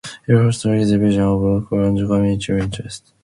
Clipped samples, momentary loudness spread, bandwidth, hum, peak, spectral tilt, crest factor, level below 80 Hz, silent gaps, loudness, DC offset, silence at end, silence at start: under 0.1%; 7 LU; 11.5 kHz; none; -2 dBFS; -7 dB/octave; 16 dB; -38 dBFS; none; -17 LUFS; under 0.1%; 0.25 s; 0.05 s